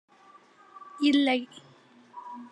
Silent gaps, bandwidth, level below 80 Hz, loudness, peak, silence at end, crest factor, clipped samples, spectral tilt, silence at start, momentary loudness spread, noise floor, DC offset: none; 10 kHz; -80 dBFS; -25 LUFS; -12 dBFS; 0.05 s; 18 dB; under 0.1%; -3.5 dB/octave; 0.85 s; 25 LU; -57 dBFS; under 0.1%